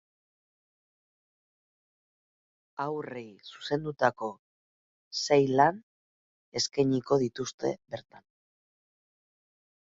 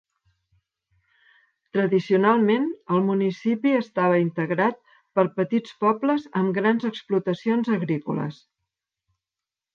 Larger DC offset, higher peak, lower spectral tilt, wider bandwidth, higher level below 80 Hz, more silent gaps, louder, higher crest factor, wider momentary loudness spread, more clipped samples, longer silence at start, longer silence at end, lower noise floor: neither; about the same, -8 dBFS vs -6 dBFS; second, -4.5 dB/octave vs -8.5 dB/octave; first, 7.8 kHz vs 7 kHz; about the same, -70 dBFS vs -74 dBFS; first, 4.39-5.11 s, 5.83-6.52 s, 7.54-7.58 s vs none; second, -29 LUFS vs -23 LUFS; first, 24 dB vs 18 dB; first, 18 LU vs 6 LU; neither; first, 2.8 s vs 1.75 s; first, 1.8 s vs 1.4 s; about the same, under -90 dBFS vs -89 dBFS